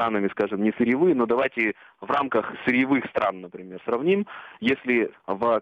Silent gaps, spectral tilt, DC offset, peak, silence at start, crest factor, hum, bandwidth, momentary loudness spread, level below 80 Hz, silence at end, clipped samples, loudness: none; -8 dB/octave; under 0.1%; -10 dBFS; 0 s; 14 dB; none; 6.4 kHz; 8 LU; -64 dBFS; 0 s; under 0.1%; -24 LUFS